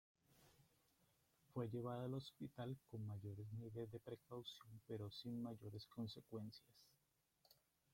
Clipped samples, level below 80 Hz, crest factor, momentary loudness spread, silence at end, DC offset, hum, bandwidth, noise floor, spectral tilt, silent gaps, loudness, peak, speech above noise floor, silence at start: under 0.1%; -82 dBFS; 20 dB; 7 LU; 0.4 s; under 0.1%; none; 16.5 kHz; -85 dBFS; -7.5 dB/octave; none; -53 LUFS; -34 dBFS; 34 dB; 0.3 s